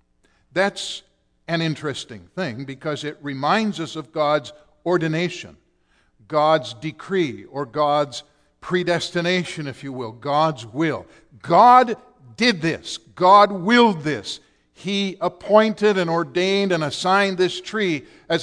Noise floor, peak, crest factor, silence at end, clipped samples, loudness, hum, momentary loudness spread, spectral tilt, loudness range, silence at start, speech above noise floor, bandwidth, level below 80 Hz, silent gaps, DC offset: -62 dBFS; -2 dBFS; 20 dB; 0 s; under 0.1%; -20 LUFS; none; 16 LU; -5 dB/octave; 8 LU; 0.55 s; 42 dB; 10.5 kHz; -62 dBFS; none; under 0.1%